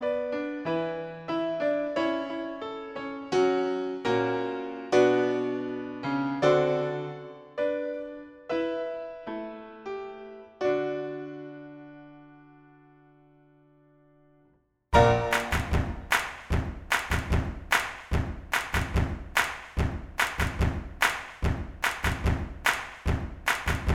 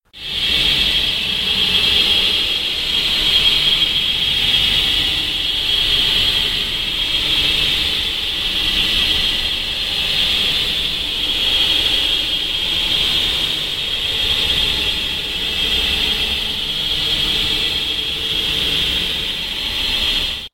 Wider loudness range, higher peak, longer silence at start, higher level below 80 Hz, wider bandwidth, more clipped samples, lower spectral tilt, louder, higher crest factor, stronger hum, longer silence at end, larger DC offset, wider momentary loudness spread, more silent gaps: first, 8 LU vs 3 LU; second, -6 dBFS vs 0 dBFS; second, 0 s vs 0.15 s; about the same, -38 dBFS vs -34 dBFS; about the same, 16.5 kHz vs 16.5 kHz; neither; first, -5.5 dB/octave vs -1.5 dB/octave; second, -29 LUFS vs -15 LUFS; first, 24 dB vs 16 dB; neither; about the same, 0 s vs 0.05 s; neither; first, 14 LU vs 6 LU; neither